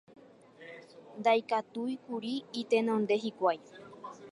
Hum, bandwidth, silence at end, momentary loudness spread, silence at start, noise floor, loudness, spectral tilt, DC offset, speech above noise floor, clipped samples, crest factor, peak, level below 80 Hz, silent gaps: none; 11.5 kHz; 0 s; 21 LU; 0.6 s; -55 dBFS; -32 LUFS; -5.5 dB/octave; under 0.1%; 24 dB; under 0.1%; 18 dB; -16 dBFS; -84 dBFS; none